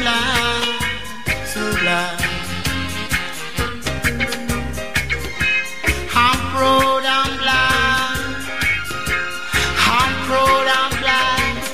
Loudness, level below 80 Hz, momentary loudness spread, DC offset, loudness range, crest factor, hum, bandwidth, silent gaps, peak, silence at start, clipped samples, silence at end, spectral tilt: -18 LUFS; -34 dBFS; 8 LU; 3%; 5 LU; 18 dB; none; 16 kHz; none; -2 dBFS; 0 s; under 0.1%; 0 s; -3 dB/octave